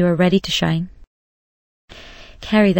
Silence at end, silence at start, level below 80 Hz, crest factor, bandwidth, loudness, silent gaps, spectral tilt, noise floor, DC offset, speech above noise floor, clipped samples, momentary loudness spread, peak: 0 s; 0 s; -44 dBFS; 18 dB; 16.5 kHz; -18 LUFS; 1.07-1.88 s; -6 dB/octave; -40 dBFS; under 0.1%; 24 dB; under 0.1%; 23 LU; -2 dBFS